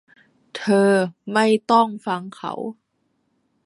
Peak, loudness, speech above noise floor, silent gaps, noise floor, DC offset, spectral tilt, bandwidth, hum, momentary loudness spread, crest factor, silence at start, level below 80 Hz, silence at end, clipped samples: -2 dBFS; -20 LUFS; 50 dB; none; -70 dBFS; under 0.1%; -5.5 dB/octave; 11.5 kHz; none; 15 LU; 18 dB; 0.55 s; -70 dBFS; 0.95 s; under 0.1%